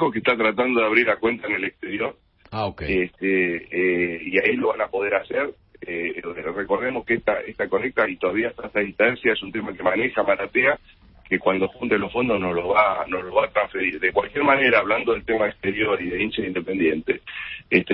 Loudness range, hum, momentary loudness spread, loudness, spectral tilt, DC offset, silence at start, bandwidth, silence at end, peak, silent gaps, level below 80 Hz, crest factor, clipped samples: 4 LU; none; 9 LU; -22 LUFS; -10 dB/octave; under 0.1%; 0 s; 5.6 kHz; 0 s; -2 dBFS; none; -52 dBFS; 20 dB; under 0.1%